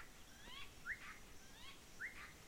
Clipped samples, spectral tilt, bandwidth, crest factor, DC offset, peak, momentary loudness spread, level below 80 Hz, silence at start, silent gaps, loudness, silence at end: under 0.1%; -2 dB/octave; 16.5 kHz; 20 dB; under 0.1%; -34 dBFS; 10 LU; -66 dBFS; 0 s; none; -53 LUFS; 0 s